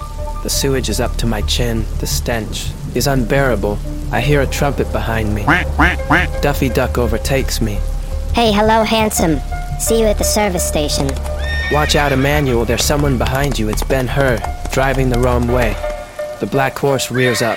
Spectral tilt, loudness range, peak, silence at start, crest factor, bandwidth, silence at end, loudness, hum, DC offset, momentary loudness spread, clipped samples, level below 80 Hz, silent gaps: -4.5 dB/octave; 2 LU; 0 dBFS; 0 s; 16 dB; 17 kHz; 0 s; -16 LUFS; none; 0.6%; 8 LU; under 0.1%; -22 dBFS; none